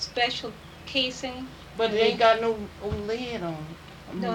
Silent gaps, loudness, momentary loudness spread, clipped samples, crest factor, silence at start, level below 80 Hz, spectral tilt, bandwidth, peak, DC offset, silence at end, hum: none; -26 LUFS; 18 LU; under 0.1%; 20 dB; 0 s; -50 dBFS; -4.5 dB/octave; 16.5 kHz; -8 dBFS; under 0.1%; 0 s; none